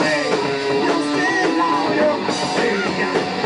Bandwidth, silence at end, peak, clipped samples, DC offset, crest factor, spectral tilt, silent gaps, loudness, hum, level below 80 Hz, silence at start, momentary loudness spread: 10.5 kHz; 0 s; -6 dBFS; under 0.1%; under 0.1%; 12 dB; -4 dB/octave; none; -18 LUFS; none; -58 dBFS; 0 s; 3 LU